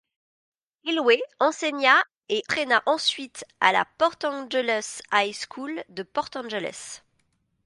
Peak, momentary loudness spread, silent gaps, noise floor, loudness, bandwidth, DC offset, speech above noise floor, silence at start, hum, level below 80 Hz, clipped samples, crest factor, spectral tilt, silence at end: -2 dBFS; 14 LU; 2.17-2.21 s; -71 dBFS; -24 LUFS; 11.5 kHz; under 0.1%; 46 dB; 0.85 s; none; -72 dBFS; under 0.1%; 24 dB; -2 dB/octave; 0.7 s